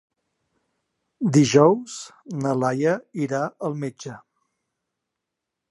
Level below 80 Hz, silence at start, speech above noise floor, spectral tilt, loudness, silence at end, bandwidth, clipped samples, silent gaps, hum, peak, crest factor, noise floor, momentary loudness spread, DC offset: -66 dBFS; 1.2 s; 62 dB; -6 dB/octave; -22 LUFS; 1.5 s; 11.5 kHz; under 0.1%; none; none; -2 dBFS; 22 dB; -83 dBFS; 19 LU; under 0.1%